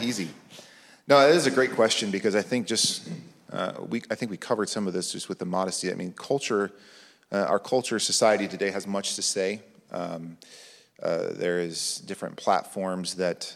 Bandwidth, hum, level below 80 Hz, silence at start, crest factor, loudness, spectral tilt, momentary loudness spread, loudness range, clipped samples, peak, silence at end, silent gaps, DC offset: 15 kHz; none; -76 dBFS; 0 s; 22 dB; -26 LUFS; -3 dB/octave; 14 LU; 7 LU; under 0.1%; -6 dBFS; 0 s; none; under 0.1%